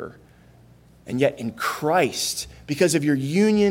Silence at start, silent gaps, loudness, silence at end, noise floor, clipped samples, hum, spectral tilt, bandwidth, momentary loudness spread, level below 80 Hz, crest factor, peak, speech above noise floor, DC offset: 0 s; none; -22 LUFS; 0 s; -51 dBFS; under 0.1%; none; -4.5 dB/octave; 17 kHz; 11 LU; -56 dBFS; 18 dB; -6 dBFS; 30 dB; under 0.1%